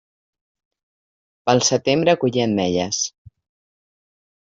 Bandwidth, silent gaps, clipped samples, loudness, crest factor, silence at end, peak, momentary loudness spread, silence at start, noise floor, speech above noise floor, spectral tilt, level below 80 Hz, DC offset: 7.8 kHz; none; under 0.1%; -19 LUFS; 20 dB; 1.35 s; -4 dBFS; 7 LU; 1.45 s; under -90 dBFS; over 72 dB; -4 dB/octave; -60 dBFS; under 0.1%